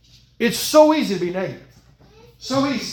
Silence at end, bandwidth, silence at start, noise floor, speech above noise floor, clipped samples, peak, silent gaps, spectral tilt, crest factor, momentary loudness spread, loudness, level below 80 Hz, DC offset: 0 s; 18 kHz; 0.4 s; -50 dBFS; 32 dB; under 0.1%; 0 dBFS; none; -4 dB/octave; 20 dB; 14 LU; -19 LUFS; -56 dBFS; under 0.1%